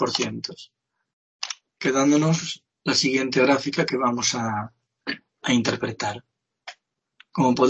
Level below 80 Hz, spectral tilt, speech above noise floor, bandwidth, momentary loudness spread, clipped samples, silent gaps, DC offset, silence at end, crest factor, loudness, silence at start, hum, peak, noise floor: -66 dBFS; -4 dB/octave; 36 dB; 8.6 kHz; 19 LU; under 0.1%; 1.13-1.39 s; under 0.1%; 0 s; 18 dB; -23 LUFS; 0 s; none; -6 dBFS; -58 dBFS